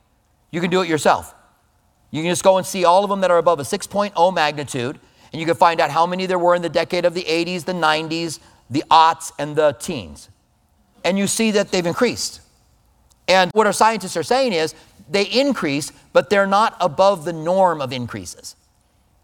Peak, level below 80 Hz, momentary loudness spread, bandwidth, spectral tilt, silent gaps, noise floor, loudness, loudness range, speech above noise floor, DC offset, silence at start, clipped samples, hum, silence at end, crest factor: 0 dBFS; -56 dBFS; 12 LU; 18 kHz; -4 dB/octave; none; -61 dBFS; -18 LUFS; 2 LU; 42 dB; under 0.1%; 0.55 s; under 0.1%; none; 0.7 s; 18 dB